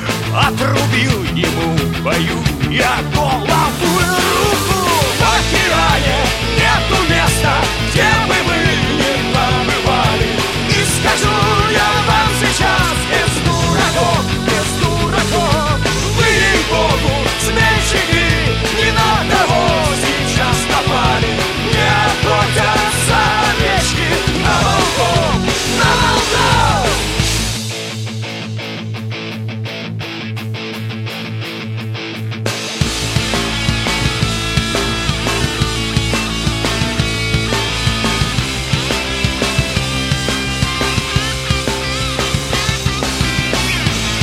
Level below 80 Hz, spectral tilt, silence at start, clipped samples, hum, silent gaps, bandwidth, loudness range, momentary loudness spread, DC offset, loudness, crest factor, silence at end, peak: -26 dBFS; -4 dB/octave; 0 s; under 0.1%; none; none; 16.5 kHz; 6 LU; 9 LU; under 0.1%; -14 LUFS; 14 dB; 0 s; 0 dBFS